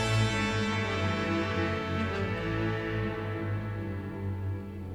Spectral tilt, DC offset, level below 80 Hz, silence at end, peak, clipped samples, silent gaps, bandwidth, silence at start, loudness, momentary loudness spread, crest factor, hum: -6 dB/octave; under 0.1%; -48 dBFS; 0 s; -14 dBFS; under 0.1%; none; 11.5 kHz; 0 s; -31 LUFS; 8 LU; 16 dB; none